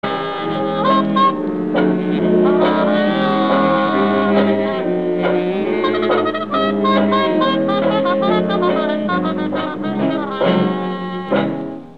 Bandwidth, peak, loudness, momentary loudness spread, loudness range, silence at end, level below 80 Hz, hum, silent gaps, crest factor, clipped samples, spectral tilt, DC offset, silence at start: 5.4 kHz; -2 dBFS; -17 LUFS; 6 LU; 3 LU; 0.05 s; -56 dBFS; none; none; 14 dB; under 0.1%; -8.5 dB/octave; 0.6%; 0.05 s